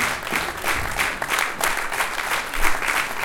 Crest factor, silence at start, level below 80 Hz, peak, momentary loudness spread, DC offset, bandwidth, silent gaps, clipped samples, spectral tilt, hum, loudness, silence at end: 22 dB; 0 s; -36 dBFS; -2 dBFS; 3 LU; under 0.1%; 17 kHz; none; under 0.1%; -1.5 dB/octave; none; -22 LUFS; 0 s